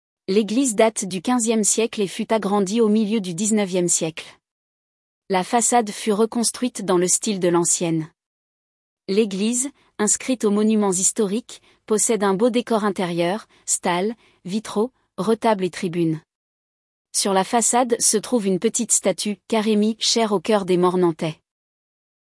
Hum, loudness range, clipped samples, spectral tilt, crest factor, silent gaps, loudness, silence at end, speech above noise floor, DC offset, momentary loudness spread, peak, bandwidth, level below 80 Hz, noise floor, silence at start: none; 4 LU; under 0.1%; -3.5 dB/octave; 16 dB; 4.51-5.22 s, 8.26-8.97 s, 16.35-17.05 s; -20 LUFS; 0.95 s; over 70 dB; under 0.1%; 8 LU; -4 dBFS; 12 kHz; -68 dBFS; under -90 dBFS; 0.3 s